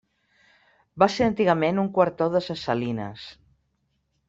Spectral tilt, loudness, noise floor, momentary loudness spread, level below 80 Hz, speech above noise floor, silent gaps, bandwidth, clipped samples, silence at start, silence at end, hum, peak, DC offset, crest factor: -6.5 dB/octave; -23 LUFS; -73 dBFS; 14 LU; -58 dBFS; 49 dB; none; 8 kHz; under 0.1%; 0.95 s; 0.95 s; none; -4 dBFS; under 0.1%; 22 dB